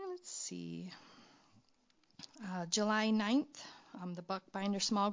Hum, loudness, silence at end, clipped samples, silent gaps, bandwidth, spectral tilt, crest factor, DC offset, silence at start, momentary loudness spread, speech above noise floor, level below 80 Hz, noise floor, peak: none; -37 LUFS; 0 s; under 0.1%; none; 7.8 kHz; -3.5 dB/octave; 20 dB; under 0.1%; 0 s; 19 LU; 36 dB; -84 dBFS; -73 dBFS; -20 dBFS